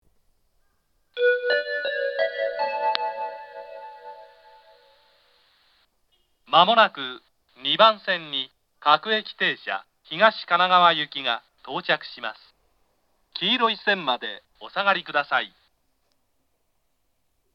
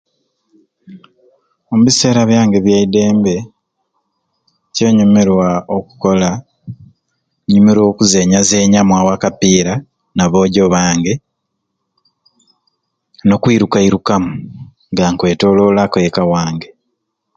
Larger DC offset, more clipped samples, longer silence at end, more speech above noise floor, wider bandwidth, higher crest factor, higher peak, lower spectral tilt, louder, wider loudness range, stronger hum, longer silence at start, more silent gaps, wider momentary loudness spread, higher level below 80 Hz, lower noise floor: neither; neither; first, 2.05 s vs 0.7 s; second, 51 dB vs 60 dB; second, 6.6 kHz vs 9.2 kHz; first, 26 dB vs 14 dB; about the same, 0 dBFS vs 0 dBFS; about the same, -5 dB/octave vs -5 dB/octave; second, -22 LUFS vs -12 LUFS; first, 8 LU vs 5 LU; neither; first, 1.15 s vs 0.9 s; neither; first, 19 LU vs 12 LU; second, -76 dBFS vs -42 dBFS; about the same, -73 dBFS vs -72 dBFS